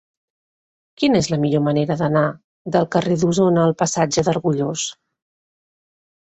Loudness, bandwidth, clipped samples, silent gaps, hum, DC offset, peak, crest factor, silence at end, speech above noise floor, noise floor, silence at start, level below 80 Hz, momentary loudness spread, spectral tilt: -19 LUFS; 8.2 kHz; under 0.1%; 2.44-2.65 s; none; under 0.1%; -2 dBFS; 18 dB; 1.3 s; over 72 dB; under -90 dBFS; 1 s; -54 dBFS; 7 LU; -5.5 dB/octave